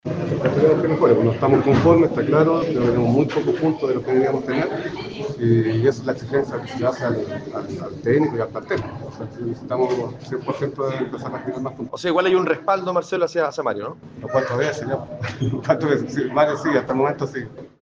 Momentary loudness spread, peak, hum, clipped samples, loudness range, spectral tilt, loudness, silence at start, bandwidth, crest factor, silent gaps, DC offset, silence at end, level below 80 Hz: 12 LU; -2 dBFS; none; under 0.1%; 7 LU; -7.5 dB/octave; -21 LUFS; 0.05 s; 7.6 kHz; 18 dB; none; under 0.1%; 0.15 s; -52 dBFS